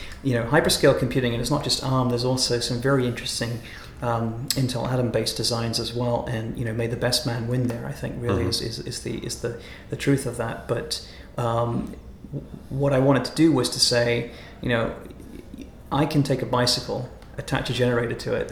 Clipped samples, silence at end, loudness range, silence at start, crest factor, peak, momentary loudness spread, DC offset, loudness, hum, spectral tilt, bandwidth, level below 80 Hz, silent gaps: under 0.1%; 0 s; 5 LU; 0 s; 20 dB; -4 dBFS; 17 LU; under 0.1%; -24 LUFS; none; -5 dB/octave; 19 kHz; -44 dBFS; none